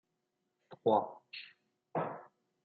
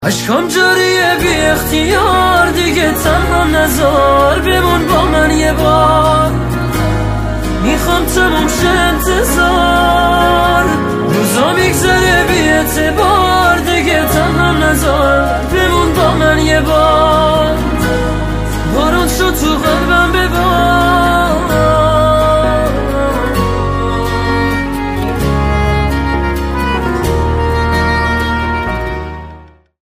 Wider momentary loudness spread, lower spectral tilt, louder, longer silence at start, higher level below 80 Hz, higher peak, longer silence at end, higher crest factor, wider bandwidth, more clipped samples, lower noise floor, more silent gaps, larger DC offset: first, 18 LU vs 6 LU; about the same, -4.5 dB/octave vs -5 dB/octave; second, -36 LUFS vs -11 LUFS; first, 0.7 s vs 0 s; second, -86 dBFS vs -20 dBFS; second, -16 dBFS vs 0 dBFS; about the same, 0.4 s vs 0.35 s; first, 24 dB vs 12 dB; second, 4.9 kHz vs 16.5 kHz; neither; first, -84 dBFS vs -36 dBFS; neither; neither